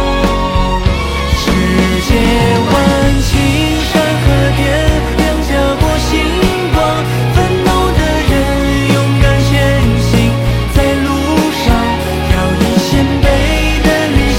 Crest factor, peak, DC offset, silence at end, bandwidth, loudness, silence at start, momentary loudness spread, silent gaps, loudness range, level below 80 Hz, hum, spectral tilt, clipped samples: 10 dB; 0 dBFS; under 0.1%; 0 s; 16.5 kHz; -12 LUFS; 0 s; 3 LU; none; 1 LU; -16 dBFS; none; -5.5 dB/octave; under 0.1%